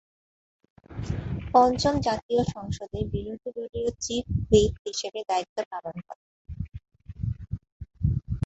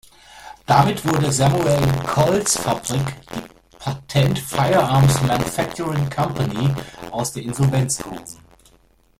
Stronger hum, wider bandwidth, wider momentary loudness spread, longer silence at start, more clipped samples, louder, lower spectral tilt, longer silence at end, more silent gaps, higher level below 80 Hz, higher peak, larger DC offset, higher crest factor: neither; second, 8.2 kHz vs 16 kHz; first, 20 LU vs 15 LU; first, 0.9 s vs 0.35 s; neither; second, -27 LUFS vs -19 LUFS; about the same, -5.5 dB/octave vs -5 dB/octave; second, 0 s vs 0.85 s; first, 2.22-2.29 s, 4.79-4.85 s, 5.49-5.56 s, 5.66-5.71 s, 6.16-6.45 s, 7.72-7.80 s vs none; about the same, -40 dBFS vs -44 dBFS; second, -6 dBFS vs -2 dBFS; neither; about the same, 22 dB vs 18 dB